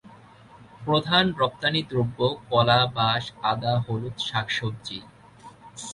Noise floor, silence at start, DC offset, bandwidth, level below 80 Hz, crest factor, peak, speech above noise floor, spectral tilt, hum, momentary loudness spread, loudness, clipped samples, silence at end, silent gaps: -50 dBFS; 0.05 s; under 0.1%; 11.5 kHz; -56 dBFS; 20 dB; -6 dBFS; 25 dB; -5 dB/octave; none; 16 LU; -24 LUFS; under 0.1%; 0 s; none